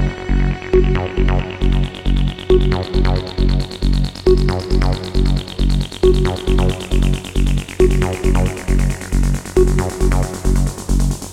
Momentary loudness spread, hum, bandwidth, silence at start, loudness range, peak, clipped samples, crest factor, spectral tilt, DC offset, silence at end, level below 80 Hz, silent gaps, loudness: 4 LU; none; 13 kHz; 0 s; 1 LU; 0 dBFS; under 0.1%; 16 dB; -6.5 dB/octave; under 0.1%; 0 s; -18 dBFS; none; -18 LUFS